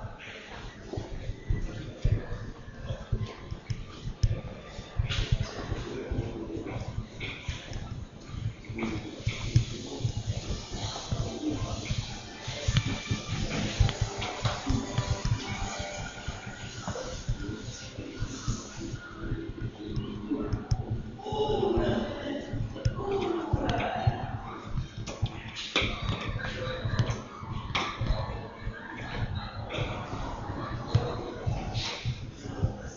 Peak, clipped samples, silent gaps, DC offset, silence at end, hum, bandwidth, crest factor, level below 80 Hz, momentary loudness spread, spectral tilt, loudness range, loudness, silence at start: -10 dBFS; under 0.1%; none; under 0.1%; 0 s; none; 7.6 kHz; 22 dB; -40 dBFS; 11 LU; -5 dB/octave; 6 LU; -34 LUFS; 0 s